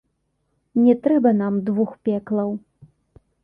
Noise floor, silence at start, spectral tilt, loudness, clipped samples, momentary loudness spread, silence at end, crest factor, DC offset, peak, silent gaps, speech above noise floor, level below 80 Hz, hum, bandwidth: -71 dBFS; 0.75 s; -11 dB/octave; -20 LUFS; under 0.1%; 9 LU; 0.85 s; 16 dB; under 0.1%; -6 dBFS; none; 52 dB; -62 dBFS; none; 3.6 kHz